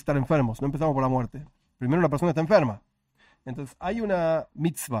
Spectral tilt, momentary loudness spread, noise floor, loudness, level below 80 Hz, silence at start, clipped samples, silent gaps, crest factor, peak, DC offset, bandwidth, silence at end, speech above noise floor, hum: -7 dB/octave; 16 LU; -64 dBFS; -25 LUFS; -48 dBFS; 0.05 s; under 0.1%; none; 20 dB; -6 dBFS; under 0.1%; 16 kHz; 0 s; 39 dB; none